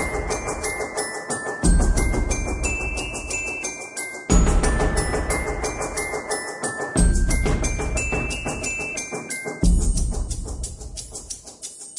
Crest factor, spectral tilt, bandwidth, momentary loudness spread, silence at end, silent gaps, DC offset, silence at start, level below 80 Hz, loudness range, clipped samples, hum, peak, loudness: 20 dB; -4.5 dB/octave; 11.5 kHz; 11 LU; 0 s; none; under 0.1%; 0 s; -26 dBFS; 2 LU; under 0.1%; none; -4 dBFS; -24 LUFS